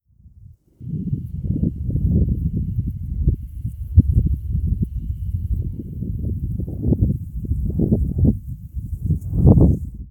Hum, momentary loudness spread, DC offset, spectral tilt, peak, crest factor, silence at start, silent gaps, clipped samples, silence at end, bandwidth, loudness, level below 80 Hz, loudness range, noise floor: none; 12 LU; under 0.1%; -13.5 dB/octave; 0 dBFS; 20 dB; 0.25 s; none; under 0.1%; 0 s; 1.3 kHz; -22 LUFS; -26 dBFS; 5 LU; -46 dBFS